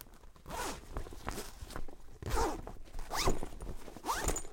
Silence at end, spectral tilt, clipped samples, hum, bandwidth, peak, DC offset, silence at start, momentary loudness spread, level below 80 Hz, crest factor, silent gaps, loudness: 0 s; -3.5 dB/octave; under 0.1%; none; 17 kHz; -18 dBFS; under 0.1%; 0 s; 15 LU; -42 dBFS; 20 dB; none; -40 LUFS